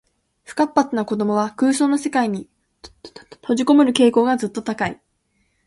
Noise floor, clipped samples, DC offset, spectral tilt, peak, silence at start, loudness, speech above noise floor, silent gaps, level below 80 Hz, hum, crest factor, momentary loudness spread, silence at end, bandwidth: -67 dBFS; under 0.1%; under 0.1%; -4.5 dB/octave; -2 dBFS; 0.5 s; -19 LUFS; 49 dB; none; -60 dBFS; none; 18 dB; 11 LU; 0.75 s; 11.5 kHz